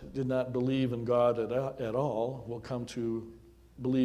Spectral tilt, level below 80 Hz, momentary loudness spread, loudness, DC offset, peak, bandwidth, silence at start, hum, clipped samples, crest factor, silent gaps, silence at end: -8 dB/octave; -58 dBFS; 11 LU; -32 LUFS; under 0.1%; -16 dBFS; 12.5 kHz; 0 s; none; under 0.1%; 16 dB; none; 0 s